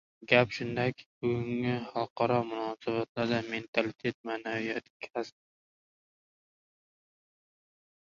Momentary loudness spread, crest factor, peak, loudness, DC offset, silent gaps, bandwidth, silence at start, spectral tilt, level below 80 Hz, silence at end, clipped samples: 12 LU; 26 dB; -6 dBFS; -32 LUFS; under 0.1%; 1.06-1.21 s, 2.10-2.16 s, 3.09-3.15 s, 3.68-3.73 s, 4.14-4.24 s, 4.90-5.00 s; 7.4 kHz; 0.2 s; -6.5 dB/octave; -68 dBFS; 2.9 s; under 0.1%